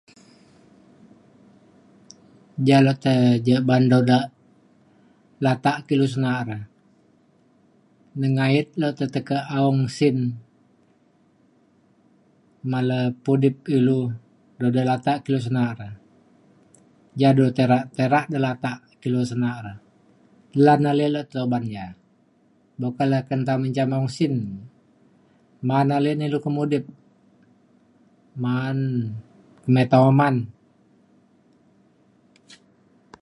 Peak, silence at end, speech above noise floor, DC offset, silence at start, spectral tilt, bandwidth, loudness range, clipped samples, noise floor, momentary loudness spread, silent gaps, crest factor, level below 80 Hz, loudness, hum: -4 dBFS; 2.7 s; 40 dB; under 0.1%; 2.55 s; -8 dB/octave; 11.5 kHz; 6 LU; under 0.1%; -60 dBFS; 16 LU; none; 20 dB; -64 dBFS; -21 LUFS; none